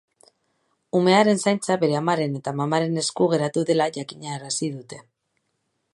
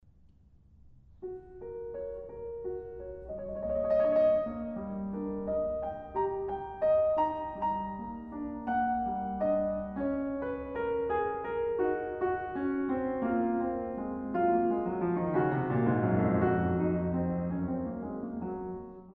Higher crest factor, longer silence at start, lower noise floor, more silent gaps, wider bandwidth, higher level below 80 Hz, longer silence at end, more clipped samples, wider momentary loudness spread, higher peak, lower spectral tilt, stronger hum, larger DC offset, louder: about the same, 20 dB vs 18 dB; about the same, 0.95 s vs 0.85 s; first, -74 dBFS vs -60 dBFS; neither; first, 11.5 kHz vs 4.8 kHz; second, -70 dBFS vs -54 dBFS; first, 0.9 s vs 0.05 s; neither; about the same, 15 LU vs 13 LU; first, -4 dBFS vs -14 dBFS; second, -5 dB/octave vs -11 dB/octave; neither; neither; first, -22 LUFS vs -32 LUFS